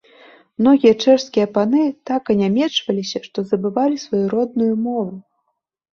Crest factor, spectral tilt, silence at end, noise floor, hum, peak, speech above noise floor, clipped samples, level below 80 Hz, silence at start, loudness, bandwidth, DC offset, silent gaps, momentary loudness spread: 16 dB; -6 dB/octave; 0.75 s; -72 dBFS; none; -2 dBFS; 55 dB; under 0.1%; -60 dBFS; 0.6 s; -18 LUFS; 7.2 kHz; under 0.1%; none; 11 LU